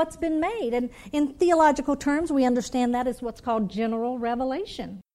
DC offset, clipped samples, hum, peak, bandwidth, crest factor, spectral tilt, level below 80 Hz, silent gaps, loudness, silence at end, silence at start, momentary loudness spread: under 0.1%; under 0.1%; none; -8 dBFS; 13 kHz; 16 dB; -5 dB/octave; -50 dBFS; none; -25 LUFS; 0.15 s; 0 s; 9 LU